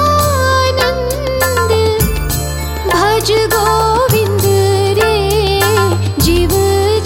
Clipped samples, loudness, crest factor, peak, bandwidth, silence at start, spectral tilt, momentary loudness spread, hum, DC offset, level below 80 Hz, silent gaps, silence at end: under 0.1%; -12 LUFS; 12 dB; 0 dBFS; 17 kHz; 0 s; -4.5 dB/octave; 4 LU; none; under 0.1%; -24 dBFS; none; 0 s